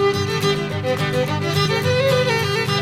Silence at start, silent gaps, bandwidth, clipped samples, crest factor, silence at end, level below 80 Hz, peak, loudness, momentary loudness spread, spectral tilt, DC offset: 0 s; none; 16 kHz; under 0.1%; 12 dB; 0 s; -52 dBFS; -6 dBFS; -19 LUFS; 4 LU; -5 dB/octave; under 0.1%